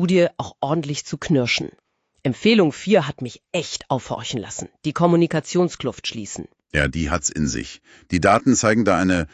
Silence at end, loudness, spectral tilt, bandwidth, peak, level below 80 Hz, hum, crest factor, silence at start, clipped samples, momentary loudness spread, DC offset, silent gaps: 0.05 s; -21 LUFS; -5 dB/octave; 9 kHz; -2 dBFS; -40 dBFS; none; 18 dB; 0 s; under 0.1%; 12 LU; under 0.1%; none